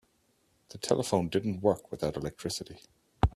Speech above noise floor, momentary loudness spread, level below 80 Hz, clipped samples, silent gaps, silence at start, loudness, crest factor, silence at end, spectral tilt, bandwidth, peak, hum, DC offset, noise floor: 40 dB; 11 LU; -44 dBFS; under 0.1%; none; 0.7 s; -32 LUFS; 24 dB; 0.05 s; -5.5 dB/octave; 14.5 kHz; -8 dBFS; none; under 0.1%; -71 dBFS